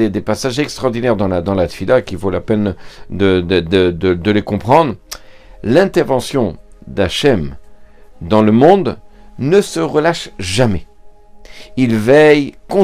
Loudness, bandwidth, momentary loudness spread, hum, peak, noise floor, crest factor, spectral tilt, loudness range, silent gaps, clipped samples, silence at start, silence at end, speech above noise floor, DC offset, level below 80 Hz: -14 LUFS; 15.5 kHz; 15 LU; none; 0 dBFS; -37 dBFS; 14 dB; -6 dB/octave; 3 LU; none; 0.2%; 0 s; 0 s; 24 dB; under 0.1%; -40 dBFS